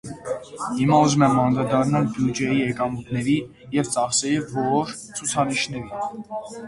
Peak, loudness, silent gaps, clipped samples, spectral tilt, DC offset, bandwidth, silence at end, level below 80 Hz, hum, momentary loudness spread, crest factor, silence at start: -4 dBFS; -22 LUFS; none; under 0.1%; -5 dB/octave; under 0.1%; 11.5 kHz; 0 s; -54 dBFS; none; 12 LU; 18 dB; 0.05 s